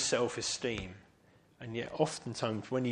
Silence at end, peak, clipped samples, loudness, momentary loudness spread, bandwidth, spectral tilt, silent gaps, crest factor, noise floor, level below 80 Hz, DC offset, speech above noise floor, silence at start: 0 s; -16 dBFS; under 0.1%; -35 LUFS; 10 LU; 11 kHz; -3.5 dB/octave; none; 20 dB; -65 dBFS; -62 dBFS; under 0.1%; 30 dB; 0 s